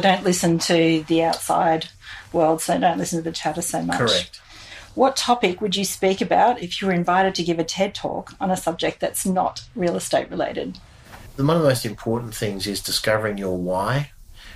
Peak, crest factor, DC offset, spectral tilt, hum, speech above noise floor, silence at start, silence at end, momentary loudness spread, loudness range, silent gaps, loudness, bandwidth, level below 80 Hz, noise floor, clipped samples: -4 dBFS; 18 dB; under 0.1%; -4.5 dB/octave; none; 21 dB; 0 s; 0 s; 9 LU; 3 LU; none; -21 LUFS; 15.5 kHz; -48 dBFS; -42 dBFS; under 0.1%